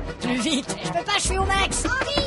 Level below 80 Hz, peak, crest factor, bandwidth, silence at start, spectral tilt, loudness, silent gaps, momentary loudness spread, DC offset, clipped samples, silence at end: -34 dBFS; -8 dBFS; 16 dB; 11.5 kHz; 0 s; -3 dB/octave; -23 LUFS; none; 5 LU; under 0.1%; under 0.1%; 0 s